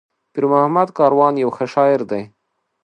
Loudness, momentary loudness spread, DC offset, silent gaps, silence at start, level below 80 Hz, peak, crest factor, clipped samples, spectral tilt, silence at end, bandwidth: -16 LUFS; 11 LU; under 0.1%; none; 0.35 s; -68 dBFS; 0 dBFS; 16 dB; under 0.1%; -8 dB/octave; 0.6 s; 9 kHz